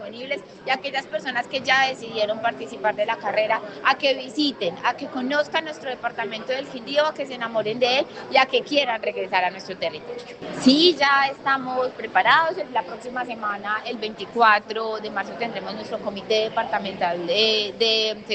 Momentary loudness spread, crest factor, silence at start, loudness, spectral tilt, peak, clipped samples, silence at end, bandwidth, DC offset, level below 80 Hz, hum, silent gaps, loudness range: 12 LU; 20 dB; 0 s; -22 LUFS; -3.5 dB/octave; -4 dBFS; under 0.1%; 0 s; 8.8 kHz; under 0.1%; -66 dBFS; none; none; 4 LU